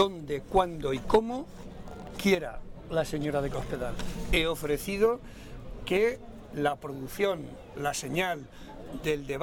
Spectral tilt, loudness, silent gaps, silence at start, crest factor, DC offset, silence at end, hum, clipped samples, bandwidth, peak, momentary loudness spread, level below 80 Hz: -5 dB/octave; -30 LUFS; none; 0 s; 20 dB; under 0.1%; 0 s; none; under 0.1%; 17 kHz; -10 dBFS; 17 LU; -42 dBFS